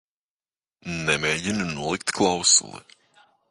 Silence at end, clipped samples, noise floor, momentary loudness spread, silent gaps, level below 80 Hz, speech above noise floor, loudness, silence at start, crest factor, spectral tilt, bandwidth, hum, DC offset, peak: 0.7 s; under 0.1%; under -90 dBFS; 15 LU; none; -54 dBFS; over 66 dB; -22 LUFS; 0.85 s; 22 dB; -2 dB/octave; 11.5 kHz; none; under 0.1%; -4 dBFS